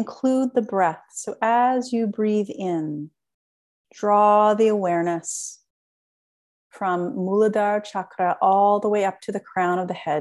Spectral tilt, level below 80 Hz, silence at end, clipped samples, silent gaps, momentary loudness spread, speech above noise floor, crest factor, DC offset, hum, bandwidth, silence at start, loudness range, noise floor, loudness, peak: -5.5 dB/octave; -74 dBFS; 0 s; under 0.1%; 3.34-3.84 s, 5.70-6.70 s; 13 LU; over 69 dB; 16 dB; under 0.1%; none; 12 kHz; 0 s; 3 LU; under -90 dBFS; -22 LUFS; -6 dBFS